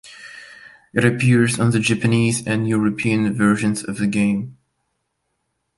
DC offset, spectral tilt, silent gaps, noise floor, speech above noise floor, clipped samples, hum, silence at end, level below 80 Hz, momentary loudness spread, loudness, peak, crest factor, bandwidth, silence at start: under 0.1%; -5.5 dB/octave; none; -73 dBFS; 55 dB; under 0.1%; none; 1.25 s; -54 dBFS; 17 LU; -19 LUFS; -2 dBFS; 18 dB; 11.5 kHz; 0.05 s